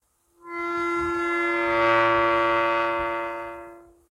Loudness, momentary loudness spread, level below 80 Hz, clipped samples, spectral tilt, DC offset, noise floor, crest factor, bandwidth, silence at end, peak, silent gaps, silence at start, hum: -23 LUFS; 15 LU; -54 dBFS; under 0.1%; -5 dB/octave; under 0.1%; -50 dBFS; 16 dB; 11.5 kHz; 0.3 s; -8 dBFS; none; 0.45 s; none